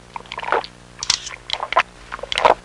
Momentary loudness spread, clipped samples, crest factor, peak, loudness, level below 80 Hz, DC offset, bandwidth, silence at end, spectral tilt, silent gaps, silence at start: 14 LU; under 0.1%; 20 dB; -2 dBFS; -21 LUFS; -48 dBFS; under 0.1%; 11.5 kHz; 0.05 s; -1 dB/octave; none; 0.15 s